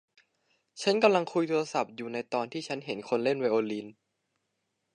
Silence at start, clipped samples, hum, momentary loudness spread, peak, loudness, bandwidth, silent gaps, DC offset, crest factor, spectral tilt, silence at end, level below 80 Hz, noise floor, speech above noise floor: 0.75 s; under 0.1%; none; 12 LU; -8 dBFS; -29 LUFS; 10.5 kHz; none; under 0.1%; 22 dB; -5 dB/octave; 1.05 s; -84 dBFS; -80 dBFS; 52 dB